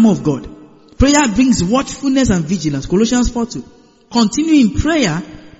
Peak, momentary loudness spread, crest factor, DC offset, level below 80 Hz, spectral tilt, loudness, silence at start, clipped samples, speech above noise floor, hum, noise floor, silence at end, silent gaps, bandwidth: 0 dBFS; 9 LU; 14 dB; under 0.1%; -30 dBFS; -5 dB/octave; -15 LUFS; 0 s; under 0.1%; 26 dB; none; -40 dBFS; 0.1 s; none; 8 kHz